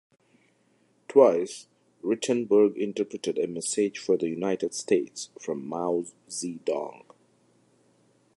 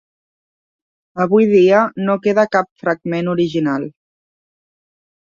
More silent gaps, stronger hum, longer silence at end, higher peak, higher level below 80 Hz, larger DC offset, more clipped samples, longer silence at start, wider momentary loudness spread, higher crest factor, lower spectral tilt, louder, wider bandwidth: second, none vs 2.71-2.76 s; neither; about the same, 1.4 s vs 1.5 s; second, -6 dBFS vs -2 dBFS; second, -76 dBFS vs -62 dBFS; neither; neither; about the same, 1.1 s vs 1.15 s; first, 14 LU vs 10 LU; first, 22 dB vs 16 dB; second, -4.5 dB/octave vs -7.5 dB/octave; second, -27 LUFS vs -16 LUFS; first, 11.5 kHz vs 7.4 kHz